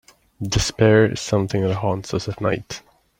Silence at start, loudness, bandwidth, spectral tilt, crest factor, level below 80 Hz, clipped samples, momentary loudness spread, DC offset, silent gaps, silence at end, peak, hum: 0.4 s; -20 LUFS; 16 kHz; -5.5 dB/octave; 18 dB; -40 dBFS; under 0.1%; 14 LU; under 0.1%; none; 0.4 s; -2 dBFS; none